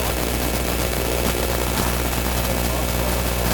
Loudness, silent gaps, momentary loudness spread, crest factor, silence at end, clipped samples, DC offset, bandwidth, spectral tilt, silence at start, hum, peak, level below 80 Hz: -21 LUFS; none; 1 LU; 16 dB; 0 s; under 0.1%; under 0.1%; 19.5 kHz; -4 dB/octave; 0 s; none; -4 dBFS; -26 dBFS